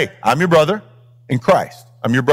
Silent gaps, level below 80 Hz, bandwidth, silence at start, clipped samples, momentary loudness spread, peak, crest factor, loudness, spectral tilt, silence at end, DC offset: none; -54 dBFS; 16.5 kHz; 0 s; under 0.1%; 12 LU; -2 dBFS; 14 dB; -16 LUFS; -6 dB/octave; 0 s; under 0.1%